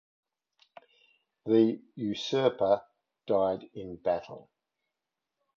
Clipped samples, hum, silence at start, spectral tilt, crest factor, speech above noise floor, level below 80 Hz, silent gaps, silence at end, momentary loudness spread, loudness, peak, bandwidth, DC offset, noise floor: under 0.1%; none; 1.45 s; -6.5 dB/octave; 20 dB; 59 dB; -68 dBFS; none; 1.2 s; 19 LU; -29 LUFS; -12 dBFS; 7.4 kHz; under 0.1%; -87 dBFS